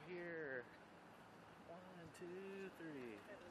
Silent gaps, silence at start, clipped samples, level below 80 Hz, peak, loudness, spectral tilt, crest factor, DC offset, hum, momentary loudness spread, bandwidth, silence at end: none; 0 s; under 0.1%; -86 dBFS; -38 dBFS; -55 LUFS; -5.5 dB/octave; 18 dB; under 0.1%; none; 13 LU; 13 kHz; 0 s